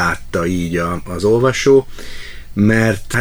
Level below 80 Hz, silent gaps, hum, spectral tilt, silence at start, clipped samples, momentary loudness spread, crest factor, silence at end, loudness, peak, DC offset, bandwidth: -34 dBFS; none; none; -6 dB/octave; 0 s; under 0.1%; 19 LU; 14 dB; 0 s; -15 LUFS; 0 dBFS; under 0.1%; over 20 kHz